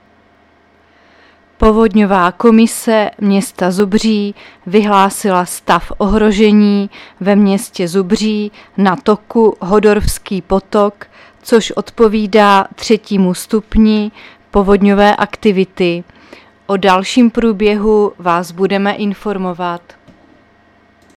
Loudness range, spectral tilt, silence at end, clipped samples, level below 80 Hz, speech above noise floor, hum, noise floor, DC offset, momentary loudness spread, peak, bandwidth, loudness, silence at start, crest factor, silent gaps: 2 LU; -5.5 dB/octave; 1.4 s; under 0.1%; -32 dBFS; 37 dB; none; -49 dBFS; under 0.1%; 10 LU; 0 dBFS; 14.5 kHz; -12 LUFS; 1.6 s; 12 dB; none